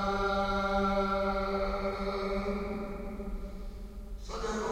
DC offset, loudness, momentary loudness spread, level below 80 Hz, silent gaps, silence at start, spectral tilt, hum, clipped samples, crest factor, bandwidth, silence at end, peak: under 0.1%; -33 LUFS; 16 LU; -40 dBFS; none; 0 s; -6 dB/octave; none; under 0.1%; 14 dB; 16 kHz; 0 s; -18 dBFS